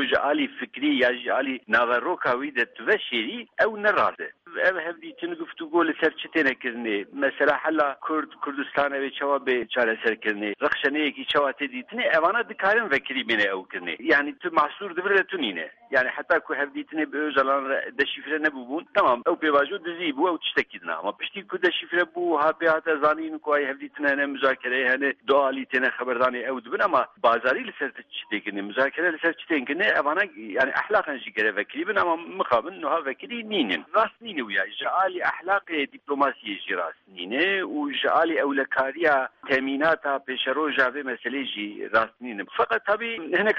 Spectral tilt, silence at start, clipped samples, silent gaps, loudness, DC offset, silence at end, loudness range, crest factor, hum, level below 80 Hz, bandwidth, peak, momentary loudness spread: -5.5 dB/octave; 0 s; under 0.1%; none; -24 LUFS; under 0.1%; 0 s; 2 LU; 16 dB; none; -68 dBFS; 7.6 kHz; -8 dBFS; 8 LU